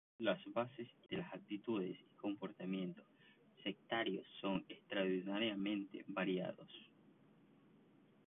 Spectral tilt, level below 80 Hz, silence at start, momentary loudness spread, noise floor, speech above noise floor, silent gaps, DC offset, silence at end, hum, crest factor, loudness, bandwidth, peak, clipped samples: -3.5 dB/octave; -82 dBFS; 0.2 s; 9 LU; -69 dBFS; 26 dB; none; under 0.1%; 1.4 s; none; 20 dB; -44 LUFS; 3.9 kHz; -24 dBFS; under 0.1%